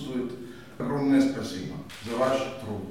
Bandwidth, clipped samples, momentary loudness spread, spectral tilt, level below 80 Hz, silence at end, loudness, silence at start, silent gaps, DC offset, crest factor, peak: 14.5 kHz; under 0.1%; 15 LU; -6 dB/octave; -58 dBFS; 0 s; -28 LUFS; 0 s; none; 0.2%; 16 dB; -12 dBFS